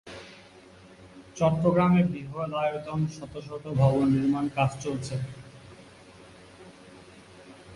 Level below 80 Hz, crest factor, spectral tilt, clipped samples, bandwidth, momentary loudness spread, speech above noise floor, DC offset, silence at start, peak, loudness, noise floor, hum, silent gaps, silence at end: -56 dBFS; 18 dB; -7.5 dB/octave; under 0.1%; 11.5 kHz; 24 LU; 26 dB; under 0.1%; 0.05 s; -10 dBFS; -26 LUFS; -51 dBFS; none; none; 0 s